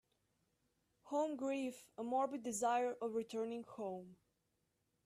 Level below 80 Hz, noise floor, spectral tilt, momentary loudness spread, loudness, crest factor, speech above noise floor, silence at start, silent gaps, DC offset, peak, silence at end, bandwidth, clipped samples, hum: -86 dBFS; -84 dBFS; -4 dB/octave; 10 LU; -41 LUFS; 16 dB; 43 dB; 1.05 s; none; under 0.1%; -26 dBFS; 0.9 s; 14.5 kHz; under 0.1%; none